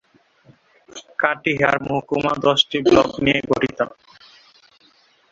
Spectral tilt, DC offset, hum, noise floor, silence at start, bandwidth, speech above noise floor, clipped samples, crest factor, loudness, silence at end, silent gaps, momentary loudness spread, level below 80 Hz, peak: -5 dB/octave; under 0.1%; none; -56 dBFS; 0.95 s; 7.8 kHz; 38 dB; under 0.1%; 20 dB; -19 LUFS; 1.4 s; none; 11 LU; -50 dBFS; 0 dBFS